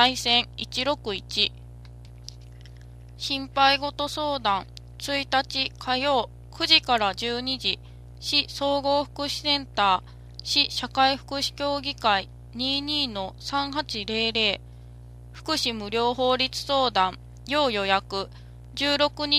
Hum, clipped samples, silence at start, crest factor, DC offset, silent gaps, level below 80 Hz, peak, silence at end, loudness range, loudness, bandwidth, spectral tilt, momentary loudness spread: 60 Hz at -45 dBFS; under 0.1%; 0 s; 24 dB; under 0.1%; none; -48 dBFS; -2 dBFS; 0 s; 3 LU; -24 LUFS; 15.5 kHz; -3 dB/octave; 12 LU